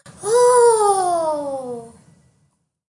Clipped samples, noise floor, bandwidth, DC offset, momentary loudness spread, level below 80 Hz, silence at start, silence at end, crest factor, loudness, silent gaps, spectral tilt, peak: under 0.1%; -65 dBFS; 11.5 kHz; under 0.1%; 17 LU; -66 dBFS; 0.05 s; 1.05 s; 14 dB; -16 LUFS; none; -2.5 dB/octave; -4 dBFS